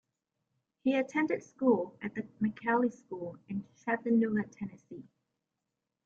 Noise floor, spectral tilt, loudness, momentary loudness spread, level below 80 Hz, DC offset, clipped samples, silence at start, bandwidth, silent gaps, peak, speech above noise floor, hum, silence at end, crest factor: -87 dBFS; -7 dB/octave; -33 LUFS; 14 LU; -76 dBFS; under 0.1%; under 0.1%; 0.85 s; 7.2 kHz; none; -16 dBFS; 55 dB; none; 1.05 s; 18 dB